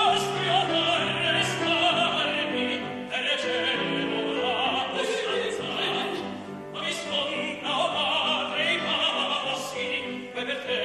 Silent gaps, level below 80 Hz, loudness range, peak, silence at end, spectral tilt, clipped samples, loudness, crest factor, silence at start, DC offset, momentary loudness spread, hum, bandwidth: none; -66 dBFS; 4 LU; -10 dBFS; 0 s; -3 dB/octave; under 0.1%; -26 LUFS; 16 dB; 0 s; under 0.1%; 8 LU; none; 13.5 kHz